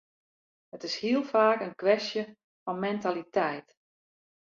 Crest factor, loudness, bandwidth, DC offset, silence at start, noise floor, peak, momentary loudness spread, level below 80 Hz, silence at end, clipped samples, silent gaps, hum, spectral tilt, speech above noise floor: 20 dB; -29 LUFS; 7.6 kHz; under 0.1%; 0.75 s; under -90 dBFS; -10 dBFS; 16 LU; -78 dBFS; 0.9 s; under 0.1%; 2.44-2.66 s; none; -5 dB/octave; over 62 dB